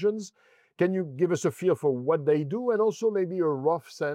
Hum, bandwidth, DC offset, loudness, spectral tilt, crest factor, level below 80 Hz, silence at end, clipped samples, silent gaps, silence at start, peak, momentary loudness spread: none; 14 kHz; under 0.1%; -27 LUFS; -7 dB/octave; 14 dB; -82 dBFS; 0 s; under 0.1%; none; 0 s; -12 dBFS; 4 LU